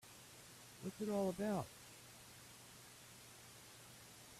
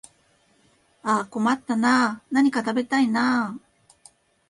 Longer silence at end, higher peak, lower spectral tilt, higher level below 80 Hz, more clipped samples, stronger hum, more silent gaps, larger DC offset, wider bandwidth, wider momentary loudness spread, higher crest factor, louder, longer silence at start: second, 0 s vs 0.9 s; second, -28 dBFS vs -8 dBFS; about the same, -5 dB/octave vs -4.5 dB/octave; second, -76 dBFS vs -68 dBFS; neither; neither; neither; neither; first, 15.5 kHz vs 11.5 kHz; first, 17 LU vs 7 LU; about the same, 20 dB vs 16 dB; second, -48 LUFS vs -23 LUFS; second, 0.05 s vs 1.05 s